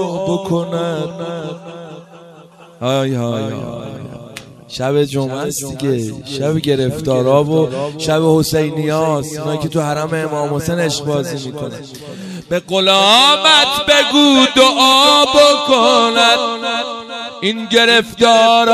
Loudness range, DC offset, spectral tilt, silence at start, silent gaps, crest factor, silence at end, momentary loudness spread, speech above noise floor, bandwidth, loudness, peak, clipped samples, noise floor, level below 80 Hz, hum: 12 LU; under 0.1%; -4 dB/octave; 0 s; none; 14 dB; 0 s; 19 LU; 27 dB; 15 kHz; -13 LUFS; 0 dBFS; under 0.1%; -41 dBFS; -48 dBFS; none